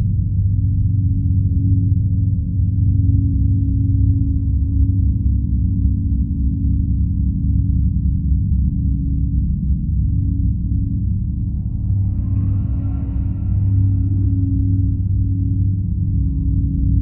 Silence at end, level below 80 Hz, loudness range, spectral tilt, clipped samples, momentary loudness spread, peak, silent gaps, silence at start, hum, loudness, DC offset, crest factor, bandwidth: 0 s; -20 dBFS; 3 LU; -16.5 dB/octave; under 0.1%; 4 LU; -4 dBFS; none; 0 s; none; -19 LUFS; under 0.1%; 12 dB; 1 kHz